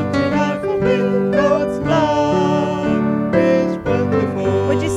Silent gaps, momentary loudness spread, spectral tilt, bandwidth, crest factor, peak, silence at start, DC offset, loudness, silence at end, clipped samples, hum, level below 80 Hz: none; 3 LU; -7 dB/octave; 11 kHz; 14 dB; -2 dBFS; 0 s; under 0.1%; -17 LUFS; 0 s; under 0.1%; none; -42 dBFS